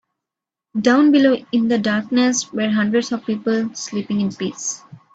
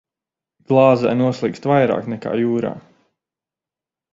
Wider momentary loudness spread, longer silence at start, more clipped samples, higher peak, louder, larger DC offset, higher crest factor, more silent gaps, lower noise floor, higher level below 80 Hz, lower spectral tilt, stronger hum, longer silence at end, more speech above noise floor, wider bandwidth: about the same, 12 LU vs 10 LU; about the same, 0.75 s vs 0.7 s; neither; about the same, -2 dBFS vs 0 dBFS; about the same, -19 LUFS vs -18 LUFS; neither; about the same, 16 dB vs 20 dB; neither; about the same, -86 dBFS vs -88 dBFS; about the same, -62 dBFS vs -60 dBFS; second, -4.5 dB/octave vs -8 dB/octave; neither; second, 0.2 s vs 1.35 s; second, 68 dB vs 72 dB; first, 8.4 kHz vs 7.6 kHz